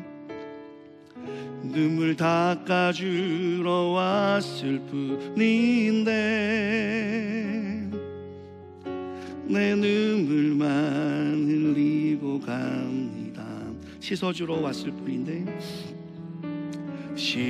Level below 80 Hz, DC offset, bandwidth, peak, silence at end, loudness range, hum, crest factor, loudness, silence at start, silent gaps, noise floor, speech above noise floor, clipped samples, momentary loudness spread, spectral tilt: -66 dBFS; under 0.1%; 11.5 kHz; -10 dBFS; 0 s; 7 LU; none; 16 dB; -26 LUFS; 0 s; none; -47 dBFS; 22 dB; under 0.1%; 16 LU; -6.5 dB/octave